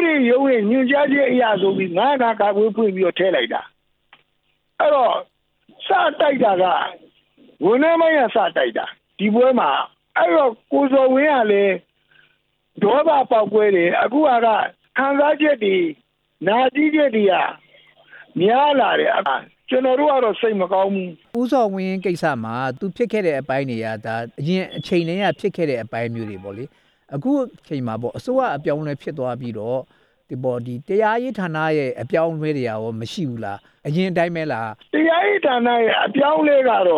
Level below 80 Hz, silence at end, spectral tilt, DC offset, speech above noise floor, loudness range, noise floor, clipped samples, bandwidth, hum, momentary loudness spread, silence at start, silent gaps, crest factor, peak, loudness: -66 dBFS; 0 s; -7 dB/octave; under 0.1%; 49 dB; 6 LU; -67 dBFS; under 0.1%; 11.5 kHz; none; 11 LU; 0 s; none; 14 dB; -6 dBFS; -19 LUFS